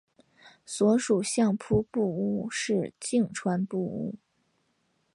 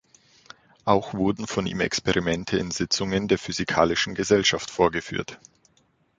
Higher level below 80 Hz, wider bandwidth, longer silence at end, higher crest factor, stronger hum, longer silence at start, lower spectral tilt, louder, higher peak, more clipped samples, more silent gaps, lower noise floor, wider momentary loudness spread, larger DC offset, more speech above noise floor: second, -58 dBFS vs -50 dBFS; first, 11.5 kHz vs 9.4 kHz; first, 1 s vs 0.8 s; second, 16 dB vs 22 dB; neither; second, 0.45 s vs 0.85 s; first, -5.5 dB/octave vs -4 dB/octave; second, -28 LUFS vs -24 LUFS; second, -12 dBFS vs -4 dBFS; neither; neither; first, -73 dBFS vs -65 dBFS; about the same, 10 LU vs 8 LU; neither; first, 46 dB vs 41 dB